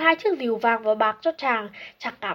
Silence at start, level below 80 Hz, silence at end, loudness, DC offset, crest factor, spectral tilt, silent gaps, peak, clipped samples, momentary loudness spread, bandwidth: 0 s; -72 dBFS; 0 s; -24 LUFS; under 0.1%; 20 dB; -5 dB/octave; none; -4 dBFS; under 0.1%; 12 LU; 16.5 kHz